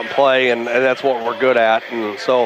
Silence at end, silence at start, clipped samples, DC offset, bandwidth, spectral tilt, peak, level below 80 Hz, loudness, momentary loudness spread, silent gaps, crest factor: 0 s; 0 s; under 0.1%; under 0.1%; 12.5 kHz; -4.5 dB/octave; -2 dBFS; -68 dBFS; -16 LUFS; 6 LU; none; 14 dB